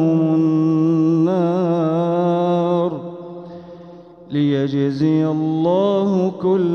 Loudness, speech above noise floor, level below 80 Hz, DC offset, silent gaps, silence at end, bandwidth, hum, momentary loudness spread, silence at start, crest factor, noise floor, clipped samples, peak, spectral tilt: -18 LUFS; 23 dB; -64 dBFS; under 0.1%; none; 0 s; 6.6 kHz; none; 16 LU; 0 s; 12 dB; -40 dBFS; under 0.1%; -6 dBFS; -9.5 dB/octave